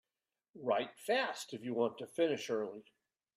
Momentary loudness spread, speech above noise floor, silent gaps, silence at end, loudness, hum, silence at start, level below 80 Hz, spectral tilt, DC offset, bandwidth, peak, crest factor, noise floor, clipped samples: 9 LU; over 53 dB; none; 0.55 s; -37 LUFS; none; 0.55 s; -86 dBFS; -4 dB/octave; under 0.1%; 14.5 kHz; -20 dBFS; 18 dB; under -90 dBFS; under 0.1%